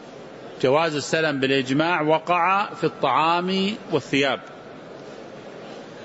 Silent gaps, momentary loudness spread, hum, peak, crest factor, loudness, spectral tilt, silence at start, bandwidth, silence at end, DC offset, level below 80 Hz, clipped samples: none; 20 LU; none; -6 dBFS; 16 dB; -22 LUFS; -5 dB/octave; 0 s; 8 kHz; 0 s; under 0.1%; -66 dBFS; under 0.1%